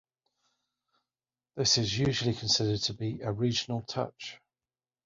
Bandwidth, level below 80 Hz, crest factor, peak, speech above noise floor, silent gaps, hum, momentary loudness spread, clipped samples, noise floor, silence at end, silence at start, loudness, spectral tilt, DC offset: 7.8 kHz; -58 dBFS; 20 dB; -12 dBFS; over 60 dB; none; none; 12 LU; under 0.1%; under -90 dBFS; 0.7 s; 1.55 s; -29 LUFS; -4 dB/octave; under 0.1%